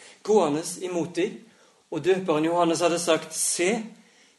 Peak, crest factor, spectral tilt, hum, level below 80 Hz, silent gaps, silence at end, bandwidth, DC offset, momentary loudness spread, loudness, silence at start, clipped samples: -6 dBFS; 18 dB; -3.5 dB/octave; none; -74 dBFS; none; 0.45 s; 12.5 kHz; under 0.1%; 8 LU; -24 LUFS; 0 s; under 0.1%